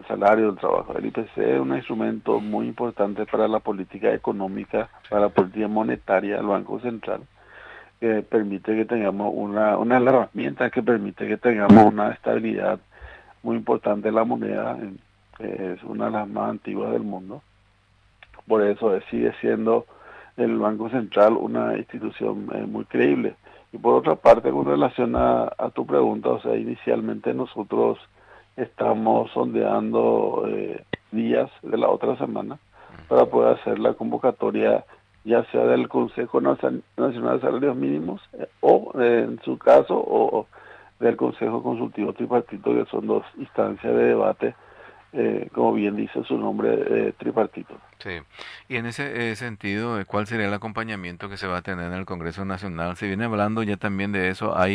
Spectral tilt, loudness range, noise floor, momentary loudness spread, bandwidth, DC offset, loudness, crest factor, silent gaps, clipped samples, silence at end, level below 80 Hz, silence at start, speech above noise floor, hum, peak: -8 dB/octave; 8 LU; -60 dBFS; 12 LU; 10.5 kHz; under 0.1%; -23 LUFS; 20 dB; none; under 0.1%; 0 s; -56 dBFS; 0 s; 38 dB; none; -2 dBFS